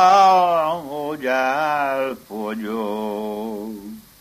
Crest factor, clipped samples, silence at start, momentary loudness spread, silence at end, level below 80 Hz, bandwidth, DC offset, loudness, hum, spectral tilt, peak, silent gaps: 18 dB; under 0.1%; 0 s; 16 LU; 0.2 s; -60 dBFS; 15 kHz; under 0.1%; -20 LUFS; none; -4.5 dB/octave; -2 dBFS; none